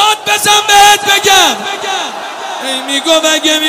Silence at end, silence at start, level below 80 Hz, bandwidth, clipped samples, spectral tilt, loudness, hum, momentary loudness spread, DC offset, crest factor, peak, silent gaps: 0 s; 0 s; -48 dBFS; 16.5 kHz; 0.6%; 0 dB/octave; -8 LUFS; none; 14 LU; under 0.1%; 10 dB; 0 dBFS; none